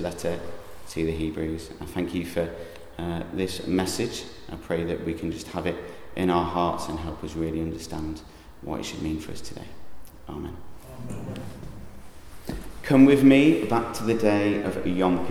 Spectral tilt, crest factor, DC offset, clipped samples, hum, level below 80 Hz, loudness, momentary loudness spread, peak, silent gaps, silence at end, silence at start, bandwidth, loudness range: -6 dB/octave; 22 dB; under 0.1%; under 0.1%; none; -46 dBFS; -25 LUFS; 20 LU; -4 dBFS; none; 0 s; 0 s; 15.5 kHz; 15 LU